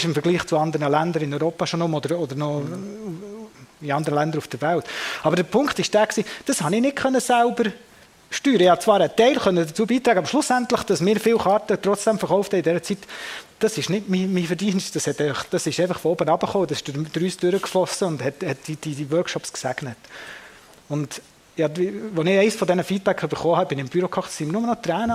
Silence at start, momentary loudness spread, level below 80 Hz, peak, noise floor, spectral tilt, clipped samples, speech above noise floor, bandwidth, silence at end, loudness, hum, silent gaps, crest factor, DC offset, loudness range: 0 s; 12 LU; -60 dBFS; -4 dBFS; -47 dBFS; -5 dB/octave; under 0.1%; 25 dB; 16 kHz; 0 s; -22 LUFS; none; none; 18 dB; under 0.1%; 7 LU